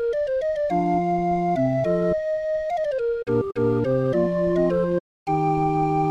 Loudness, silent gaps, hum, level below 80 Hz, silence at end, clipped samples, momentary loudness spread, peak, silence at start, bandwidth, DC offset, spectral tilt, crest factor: -23 LUFS; 5.00-5.26 s; none; -46 dBFS; 0 s; under 0.1%; 4 LU; -10 dBFS; 0 s; 8.2 kHz; under 0.1%; -9 dB/octave; 12 dB